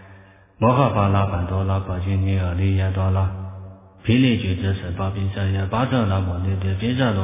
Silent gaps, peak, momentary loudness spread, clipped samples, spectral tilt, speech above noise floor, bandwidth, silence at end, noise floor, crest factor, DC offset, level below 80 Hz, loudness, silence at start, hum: none; -2 dBFS; 7 LU; under 0.1%; -11.5 dB/octave; 28 dB; 3.8 kHz; 0 s; -47 dBFS; 18 dB; under 0.1%; -32 dBFS; -21 LUFS; 0 s; none